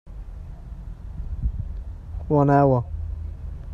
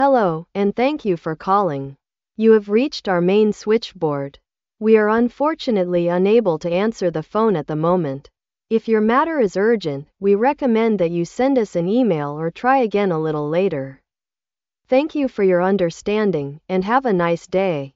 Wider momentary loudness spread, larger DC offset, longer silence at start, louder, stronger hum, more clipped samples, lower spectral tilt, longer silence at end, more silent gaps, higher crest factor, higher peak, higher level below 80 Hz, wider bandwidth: first, 22 LU vs 7 LU; neither; about the same, 0.05 s vs 0 s; second, -23 LUFS vs -19 LUFS; neither; neither; first, -11 dB/octave vs -5.5 dB/octave; about the same, 0 s vs 0.05 s; neither; about the same, 18 dB vs 16 dB; second, -6 dBFS vs -2 dBFS; first, -34 dBFS vs -56 dBFS; second, 5.6 kHz vs 7.8 kHz